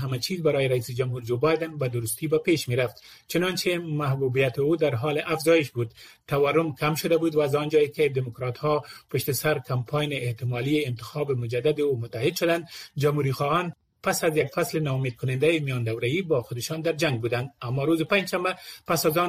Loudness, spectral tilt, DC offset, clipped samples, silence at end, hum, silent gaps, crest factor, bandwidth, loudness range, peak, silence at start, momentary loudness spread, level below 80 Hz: -26 LUFS; -5.5 dB/octave; under 0.1%; under 0.1%; 0 s; none; none; 16 dB; 15.5 kHz; 2 LU; -10 dBFS; 0 s; 7 LU; -60 dBFS